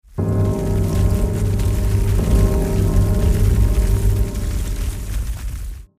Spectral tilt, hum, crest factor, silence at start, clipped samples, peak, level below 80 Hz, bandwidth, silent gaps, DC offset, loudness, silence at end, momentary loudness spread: -7 dB/octave; none; 14 dB; 0.15 s; under 0.1%; -4 dBFS; -20 dBFS; 16 kHz; none; under 0.1%; -19 LUFS; 0.15 s; 9 LU